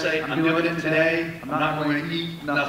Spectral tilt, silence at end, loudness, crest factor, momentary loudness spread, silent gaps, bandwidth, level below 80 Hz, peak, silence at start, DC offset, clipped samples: -6 dB/octave; 0 s; -23 LUFS; 16 dB; 7 LU; none; 16 kHz; -56 dBFS; -8 dBFS; 0 s; under 0.1%; under 0.1%